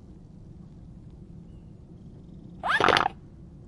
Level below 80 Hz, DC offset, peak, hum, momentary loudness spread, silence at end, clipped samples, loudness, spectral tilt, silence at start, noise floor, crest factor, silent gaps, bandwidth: -52 dBFS; under 0.1%; -2 dBFS; none; 27 LU; 0.1 s; under 0.1%; -24 LUFS; -4 dB/octave; 0.1 s; -47 dBFS; 30 dB; none; 11.5 kHz